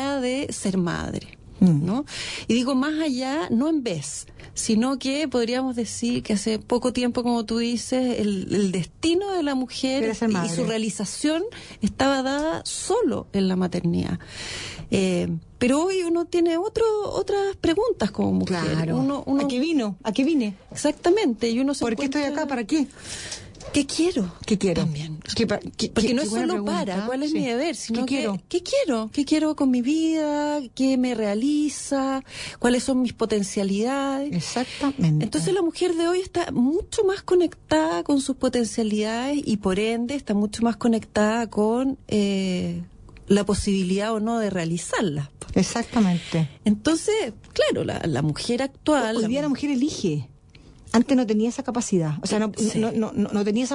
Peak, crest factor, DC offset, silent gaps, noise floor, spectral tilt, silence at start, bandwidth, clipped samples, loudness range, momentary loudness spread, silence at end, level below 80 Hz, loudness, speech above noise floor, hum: -6 dBFS; 16 dB; under 0.1%; none; -49 dBFS; -5 dB/octave; 0 s; 11 kHz; under 0.1%; 2 LU; 5 LU; 0 s; -50 dBFS; -24 LUFS; 26 dB; none